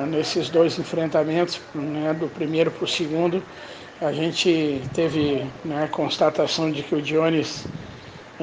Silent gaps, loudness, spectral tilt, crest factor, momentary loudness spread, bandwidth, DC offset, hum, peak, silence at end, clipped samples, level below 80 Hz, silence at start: none; -23 LUFS; -5 dB/octave; 16 dB; 12 LU; 9.6 kHz; under 0.1%; none; -6 dBFS; 0 s; under 0.1%; -60 dBFS; 0 s